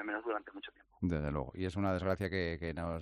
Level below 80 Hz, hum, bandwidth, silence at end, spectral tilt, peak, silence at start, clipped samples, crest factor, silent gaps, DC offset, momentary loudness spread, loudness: -54 dBFS; none; 13 kHz; 0 s; -7.5 dB/octave; -20 dBFS; 0 s; under 0.1%; 18 dB; none; under 0.1%; 10 LU; -37 LUFS